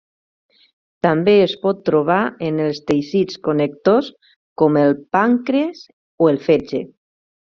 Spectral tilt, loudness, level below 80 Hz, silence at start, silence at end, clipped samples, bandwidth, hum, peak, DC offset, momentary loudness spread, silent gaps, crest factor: -5.5 dB/octave; -17 LUFS; -58 dBFS; 1.05 s; 0.6 s; under 0.1%; 7.2 kHz; none; -2 dBFS; under 0.1%; 7 LU; 4.36-4.56 s, 5.93-6.18 s; 16 dB